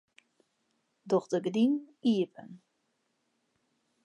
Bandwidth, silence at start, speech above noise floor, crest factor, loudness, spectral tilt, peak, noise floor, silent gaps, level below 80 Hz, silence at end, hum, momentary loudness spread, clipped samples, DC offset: 10.5 kHz; 1.05 s; 49 dB; 18 dB; -30 LUFS; -6.5 dB/octave; -16 dBFS; -78 dBFS; none; -86 dBFS; 1.5 s; none; 7 LU; under 0.1%; under 0.1%